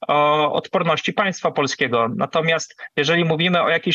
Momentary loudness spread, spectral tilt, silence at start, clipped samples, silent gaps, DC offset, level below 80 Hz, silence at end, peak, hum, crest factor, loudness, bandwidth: 4 LU; -4.5 dB/octave; 0 s; under 0.1%; none; under 0.1%; -66 dBFS; 0 s; -6 dBFS; none; 14 dB; -19 LUFS; 8 kHz